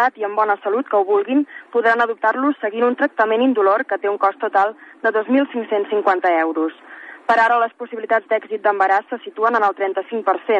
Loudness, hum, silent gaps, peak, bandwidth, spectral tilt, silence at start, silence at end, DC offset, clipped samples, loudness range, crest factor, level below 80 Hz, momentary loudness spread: -18 LUFS; none; none; -4 dBFS; 8.2 kHz; -5.5 dB/octave; 0 s; 0 s; under 0.1%; under 0.1%; 1 LU; 14 dB; -80 dBFS; 7 LU